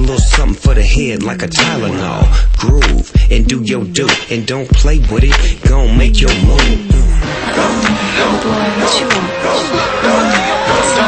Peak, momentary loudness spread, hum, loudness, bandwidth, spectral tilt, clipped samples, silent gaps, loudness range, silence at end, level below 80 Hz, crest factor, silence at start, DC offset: 0 dBFS; 4 LU; none; -12 LUFS; 8.8 kHz; -4.5 dB/octave; under 0.1%; none; 1 LU; 0 s; -12 dBFS; 10 dB; 0 s; under 0.1%